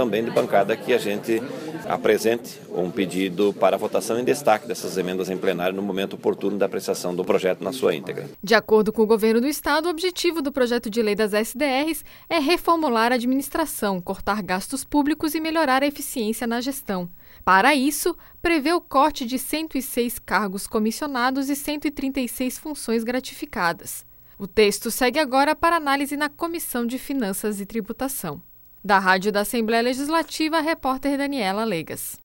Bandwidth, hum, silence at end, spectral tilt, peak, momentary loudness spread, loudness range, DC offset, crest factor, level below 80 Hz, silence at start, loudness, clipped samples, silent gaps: over 20 kHz; none; 0.05 s; -4 dB/octave; -2 dBFS; 8 LU; 3 LU; under 0.1%; 20 dB; -50 dBFS; 0 s; -23 LUFS; under 0.1%; none